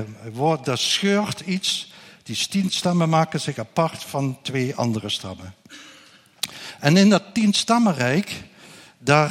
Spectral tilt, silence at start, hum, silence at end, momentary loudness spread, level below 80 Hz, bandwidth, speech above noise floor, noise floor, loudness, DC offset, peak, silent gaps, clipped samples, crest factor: -4.5 dB/octave; 0 s; none; 0 s; 16 LU; -64 dBFS; 15.5 kHz; 30 dB; -51 dBFS; -21 LUFS; under 0.1%; 0 dBFS; none; under 0.1%; 22 dB